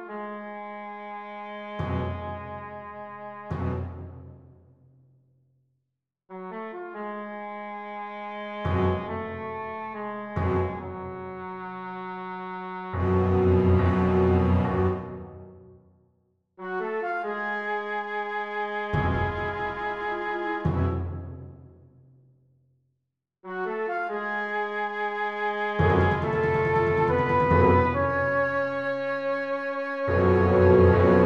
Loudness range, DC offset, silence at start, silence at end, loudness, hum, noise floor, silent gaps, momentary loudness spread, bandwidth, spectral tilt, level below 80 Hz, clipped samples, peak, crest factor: 15 LU; under 0.1%; 0 s; 0 s; -26 LUFS; none; -82 dBFS; none; 17 LU; 6 kHz; -9 dB/octave; -44 dBFS; under 0.1%; -6 dBFS; 22 dB